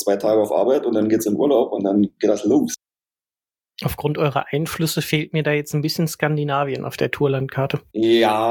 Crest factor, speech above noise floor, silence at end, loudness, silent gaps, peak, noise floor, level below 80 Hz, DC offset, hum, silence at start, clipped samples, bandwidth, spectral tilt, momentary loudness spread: 18 dB; over 71 dB; 0 s; -20 LUFS; none; -2 dBFS; under -90 dBFS; -54 dBFS; under 0.1%; none; 0 s; under 0.1%; 17.5 kHz; -5.5 dB/octave; 7 LU